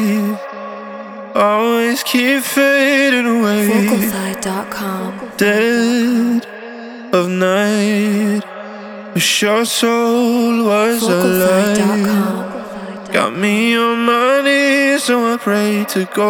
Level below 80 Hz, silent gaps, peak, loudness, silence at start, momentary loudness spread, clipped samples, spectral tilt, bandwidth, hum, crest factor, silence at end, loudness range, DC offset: -58 dBFS; none; 0 dBFS; -14 LUFS; 0 s; 15 LU; under 0.1%; -4 dB/octave; 19.5 kHz; none; 14 dB; 0 s; 3 LU; under 0.1%